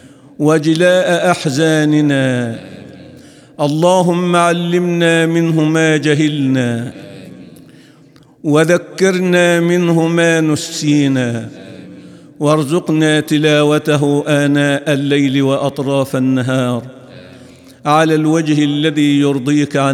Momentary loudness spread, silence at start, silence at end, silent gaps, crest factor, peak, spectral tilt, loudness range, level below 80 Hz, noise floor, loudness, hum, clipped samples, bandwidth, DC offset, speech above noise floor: 11 LU; 0.4 s; 0 s; none; 14 dB; 0 dBFS; -5.5 dB/octave; 3 LU; -62 dBFS; -44 dBFS; -13 LUFS; none; under 0.1%; 14.5 kHz; under 0.1%; 32 dB